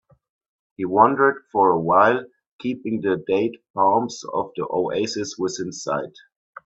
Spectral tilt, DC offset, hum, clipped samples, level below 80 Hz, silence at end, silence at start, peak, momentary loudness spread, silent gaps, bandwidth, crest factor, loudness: -5 dB/octave; under 0.1%; none; under 0.1%; -64 dBFS; 0.55 s; 0.8 s; 0 dBFS; 12 LU; 2.47-2.59 s, 3.70-3.74 s; 8 kHz; 22 dB; -21 LUFS